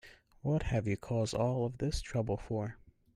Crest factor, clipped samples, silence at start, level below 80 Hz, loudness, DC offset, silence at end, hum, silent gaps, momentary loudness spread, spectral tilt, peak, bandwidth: 16 dB; under 0.1%; 0.05 s; -48 dBFS; -35 LUFS; under 0.1%; 0.25 s; none; none; 6 LU; -6.5 dB/octave; -20 dBFS; 12 kHz